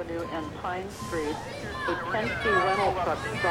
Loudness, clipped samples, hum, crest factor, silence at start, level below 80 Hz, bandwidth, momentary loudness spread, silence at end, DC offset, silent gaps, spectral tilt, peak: -29 LUFS; under 0.1%; none; 18 dB; 0 s; -48 dBFS; 17 kHz; 10 LU; 0 s; under 0.1%; none; -5 dB/octave; -12 dBFS